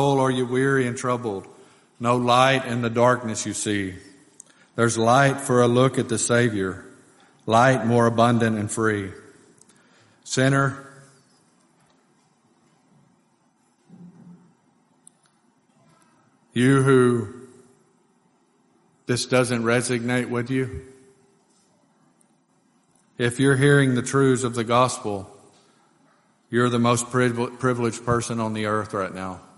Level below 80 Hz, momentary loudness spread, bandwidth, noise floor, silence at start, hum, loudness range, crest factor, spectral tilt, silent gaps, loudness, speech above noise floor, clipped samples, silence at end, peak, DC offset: -60 dBFS; 13 LU; 11.5 kHz; -64 dBFS; 0 s; none; 7 LU; 20 dB; -5.5 dB/octave; none; -21 LUFS; 43 dB; under 0.1%; 0.2 s; -4 dBFS; under 0.1%